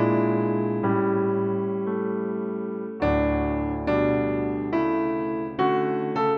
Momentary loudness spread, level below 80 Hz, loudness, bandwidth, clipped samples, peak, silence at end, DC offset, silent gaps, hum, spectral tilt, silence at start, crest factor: 6 LU; -42 dBFS; -25 LUFS; 6 kHz; under 0.1%; -10 dBFS; 0 s; under 0.1%; none; none; -10 dB/octave; 0 s; 14 dB